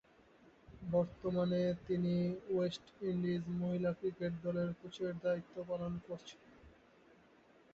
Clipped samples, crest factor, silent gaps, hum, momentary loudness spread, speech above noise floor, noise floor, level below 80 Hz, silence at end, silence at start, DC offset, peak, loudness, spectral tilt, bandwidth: under 0.1%; 16 dB; none; none; 9 LU; 28 dB; -66 dBFS; -66 dBFS; 1.05 s; 0.7 s; under 0.1%; -22 dBFS; -39 LUFS; -7.5 dB/octave; 7.6 kHz